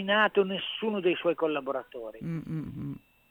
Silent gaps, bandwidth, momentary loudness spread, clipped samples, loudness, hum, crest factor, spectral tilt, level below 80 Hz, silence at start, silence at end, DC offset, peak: none; 19.5 kHz; 15 LU; under 0.1%; -30 LUFS; none; 20 dB; -7.5 dB/octave; -64 dBFS; 0 s; 0.35 s; under 0.1%; -10 dBFS